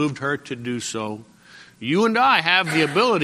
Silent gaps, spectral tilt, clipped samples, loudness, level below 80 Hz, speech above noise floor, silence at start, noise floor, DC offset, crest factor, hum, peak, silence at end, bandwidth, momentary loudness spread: none; -4 dB/octave; under 0.1%; -20 LUFS; -64 dBFS; 27 dB; 0 s; -47 dBFS; under 0.1%; 20 dB; none; -2 dBFS; 0 s; 14.5 kHz; 14 LU